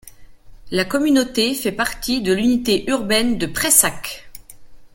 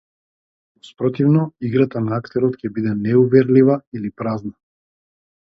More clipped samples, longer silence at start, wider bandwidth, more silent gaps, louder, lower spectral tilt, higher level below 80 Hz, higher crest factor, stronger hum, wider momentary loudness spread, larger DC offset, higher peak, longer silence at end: neither; second, 0.05 s vs 0.85 s; first, 17 kHz vs 5.8 kHz; second, none vs 3.87-3.92 s; about the same, -18 LUFS vs -18 LUFS; second, -2.5 dB/octave vs -10.5 dB/octave; first, -44 dBFS vs -58 dBFS; about the same, 20 dB vs 18 dB; neither; about the same, 10 LU vs 12 LU; neither; about the same, 0 dBFS vs -2 dBFS; second, 0.1 s vs 1 s